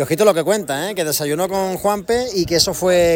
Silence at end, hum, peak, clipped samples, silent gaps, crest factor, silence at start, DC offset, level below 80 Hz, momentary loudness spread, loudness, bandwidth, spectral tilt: 0 s; none; -2 dBFS; under 0.1%; none; 16 dB; 0 s; under 0.1%; -44 dBFS; 5 LU; -18 LUFS; 17 kHz; -3.5 dB/octave